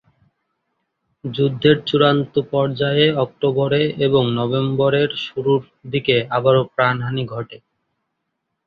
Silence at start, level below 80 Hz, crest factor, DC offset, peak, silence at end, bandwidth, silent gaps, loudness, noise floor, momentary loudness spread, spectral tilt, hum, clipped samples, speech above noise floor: 1.25 s; -56 dBFS; 18 dB; under 0.1%; -2 dBFS; 1.1 s; 6.2 kHz; none; -18 LUFS; -76 dBFS; 9 LU; -8.5 dB/octave; none; under 0.1%; 58 dB